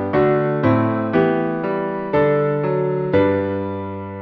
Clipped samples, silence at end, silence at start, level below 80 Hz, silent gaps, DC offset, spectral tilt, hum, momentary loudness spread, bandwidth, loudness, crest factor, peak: under 0.1%; 0 s; 0 s; -50 dBFS; none; under 0.1%; -10.5 dB/octave; none; 7 LU; 5.6 kHz; -19 LUFS; 16 dB; -2 dBFS